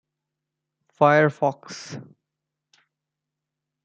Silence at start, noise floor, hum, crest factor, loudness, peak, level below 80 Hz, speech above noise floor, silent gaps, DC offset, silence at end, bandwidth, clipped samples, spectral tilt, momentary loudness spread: 1 s; -85 dBFS; none; 24 dB; -20 LUFS; -4 dBFS; -76 dBFS; 64 dB; none; under 0.1%; 1.85 s; 8.4 kHz; under 0.1%; -6 dB/octave; 21 LU